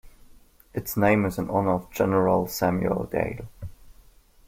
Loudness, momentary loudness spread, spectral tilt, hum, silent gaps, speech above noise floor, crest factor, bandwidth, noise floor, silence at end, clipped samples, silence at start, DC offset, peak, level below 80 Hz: -25 LUFS; 16 LU; -6.5 dB/octave; none; none; 30 dB; 20 dB; 16.5 kHz; -54 dBFS; 0.55 s; under 0.1%; 0.05 s; under 0.1%; -6 dBFS; -48 dBFS